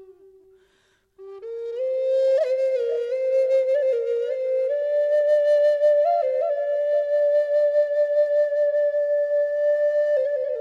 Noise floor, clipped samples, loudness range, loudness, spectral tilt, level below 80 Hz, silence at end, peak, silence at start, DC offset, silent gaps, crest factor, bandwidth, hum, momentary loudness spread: -64 dBFS; under 0.1%; 3 LU; -21 LUFS; -2 dB/octave; -74 dBFS; 0 s; -12 dBFS; 0 s; under 0.1%; none; 10 dB; 6.2 kHz; none; 6 LU